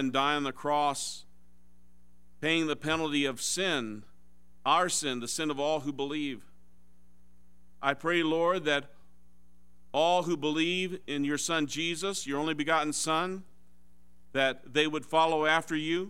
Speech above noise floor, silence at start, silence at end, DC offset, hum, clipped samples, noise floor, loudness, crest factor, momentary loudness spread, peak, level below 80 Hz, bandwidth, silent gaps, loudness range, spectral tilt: 35 dB; 0 s; 0 s; 0.5%; none; under 0.1%; -65 dBFS; -29 LUFS; 22 dB; 9 LU; -8 dBFS; -68 dBFS; 16 kHz; none; 3 LU; -3 dB/octave